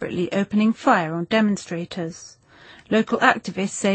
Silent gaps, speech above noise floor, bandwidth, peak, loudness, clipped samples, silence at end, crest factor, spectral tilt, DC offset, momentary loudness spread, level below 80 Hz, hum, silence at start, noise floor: none; 27 dB; 8.8 kHz; -2 dBFS; -21 LUFS; under 0.1%; 0 s; 20 dB; -5 dB/octave; under 0.1%; 12 LU; -60 dBFS; none; 0 s; -48 dBFS